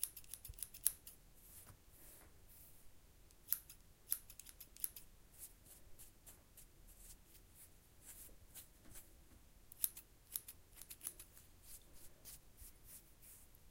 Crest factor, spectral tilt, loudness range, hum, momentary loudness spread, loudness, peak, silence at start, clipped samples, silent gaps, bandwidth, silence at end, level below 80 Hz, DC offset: 44 dB; -0.5 dB/octave; 12 LU; none; 21 LU; -48 LUFS; -10 dBFS; 0 s; under 0.1%; none; 17 kHz; 0 s; -68 dBFS; under 0.1%